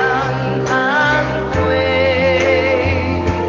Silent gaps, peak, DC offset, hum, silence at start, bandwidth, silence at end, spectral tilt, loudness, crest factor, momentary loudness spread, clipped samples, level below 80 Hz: none; -2 dBFS; under 0.1%; none; 0 s; 7.4 kHz; 0 s; -6 dB/octave; -15 LUFS; 12 dB; 5 LU; under 0.1%; -28 dBFS